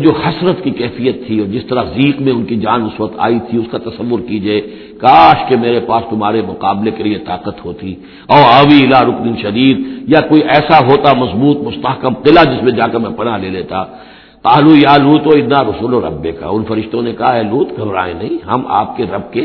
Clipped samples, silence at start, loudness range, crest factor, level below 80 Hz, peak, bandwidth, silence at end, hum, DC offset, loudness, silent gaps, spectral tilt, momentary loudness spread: 0.7%; 0 s; 6 LU; 12 dB; -42 dBFS; 0 dBFS; 5.4 kHz; 0 s; none; under 0.1%; -11 LUFS; none; -8.5 dB/octave; 13 LU